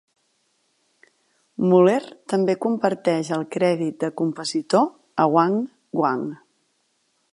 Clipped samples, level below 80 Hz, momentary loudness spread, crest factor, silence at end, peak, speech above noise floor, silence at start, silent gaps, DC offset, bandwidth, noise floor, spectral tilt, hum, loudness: under 0.1%; -74 dBFS; 9 LU; 18 dB; 1 s; -4 dBFS; 48 dB; 1.6 s; none; under 0.1%; 11.5 kHz; -69 dBFS; -6.5 dB/octave; none; -22 LUFS